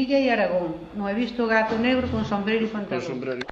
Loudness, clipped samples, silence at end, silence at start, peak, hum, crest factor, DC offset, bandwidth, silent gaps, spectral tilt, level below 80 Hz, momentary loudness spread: -24 LUFS; under 0.1%; 0 s; 0 s; -8 dBFS; none; 16 dB; under 0.1%; 7.6 kHz; none; -6.5 dB/octave; -50 dBFS; 9 LU